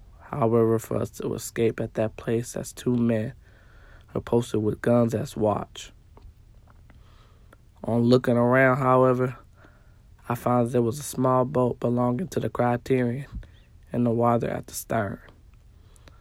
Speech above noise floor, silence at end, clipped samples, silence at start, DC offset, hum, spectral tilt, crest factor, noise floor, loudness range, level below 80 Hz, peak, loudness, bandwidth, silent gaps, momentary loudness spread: 29 dB; 1 s; under 0.1%; 0.25 s; under 0.1%; none; -7 dB/octave; 20 dB; -53 dBFS; 5 LU; -52 dBFS; -6 dBFS; -25 LUFS; 16 kHz; none; 15 LU